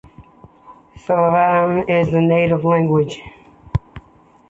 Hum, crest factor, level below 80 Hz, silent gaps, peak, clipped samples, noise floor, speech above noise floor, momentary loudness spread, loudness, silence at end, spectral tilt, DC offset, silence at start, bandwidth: none; 14 dB; -42 dBFS; none; -4 dBFS; under 0.1%; -50 dBFS; 34 dB; 12 LU; -16 LUFS; 0.5 s; -8.5 dB/octave; under 0.1%; 0.2 s; 7.8 kHz